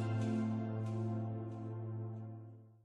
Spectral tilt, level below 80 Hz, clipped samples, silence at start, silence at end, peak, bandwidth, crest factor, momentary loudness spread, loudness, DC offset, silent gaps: -9 dB/octave; -74 dBFS; under 0.1%; 0 s; 0.1 s; -26 dBFS; 8.2 kHz; 14 dB; 13 LU; -41 LUFS; under 0.1%; none